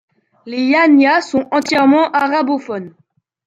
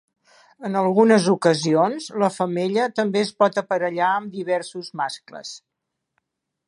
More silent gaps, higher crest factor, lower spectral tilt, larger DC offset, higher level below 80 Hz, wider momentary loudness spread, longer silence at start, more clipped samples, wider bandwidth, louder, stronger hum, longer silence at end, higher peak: neither; second, 12 dB vs 20 dB; about the same, -4.5 dB/octave vs -5.5 dB/octave; neither; first, -62 dBFS vs -74 dBFS; second, 14 LU vs 17 LU; second, 0.45 s vs 0.6 s; neither; second, 8.8 kHz vs 11 kHz; first, -13 LUFS vs -21 LUFS; neither; second, 0.55 s vs 1.1 s; about the same, -2 dBFS vs -2 dBFS